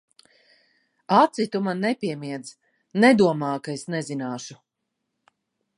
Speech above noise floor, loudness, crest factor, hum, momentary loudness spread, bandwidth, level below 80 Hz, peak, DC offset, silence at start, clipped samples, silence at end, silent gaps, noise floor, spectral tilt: 58 dB; -23 LUFS; 22 dB; none; 17 LU; 11 kHz; -72 dBFS; -4 dBFS; under 0.1%; 1.1 s; under 0.1%; 1.25 s; none; -80 dBFS; -5.5 dB/octave